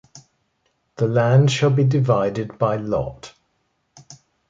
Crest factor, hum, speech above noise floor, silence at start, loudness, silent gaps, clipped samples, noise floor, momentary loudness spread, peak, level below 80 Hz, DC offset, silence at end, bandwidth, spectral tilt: 16 dB; none; 51 dB; 0.15 s; -19 LUFS; none; under 0.1%; -69 dBFS; 9 LU; -4 dBFS; -52 dBFS; under 0.1%; 0.35 s; 7.6 kHz; -7 dB/octave